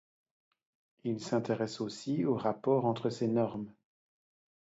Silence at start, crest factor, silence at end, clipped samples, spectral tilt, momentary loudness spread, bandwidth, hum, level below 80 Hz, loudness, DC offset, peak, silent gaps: 1.05 s; 18 dB; 1.05 s; under 0.1%; -7 dB/octave; 9 LU; 8 kHz; none; -76 dBFS; -33 LUFS; under 0.1%; -16 dBFS; none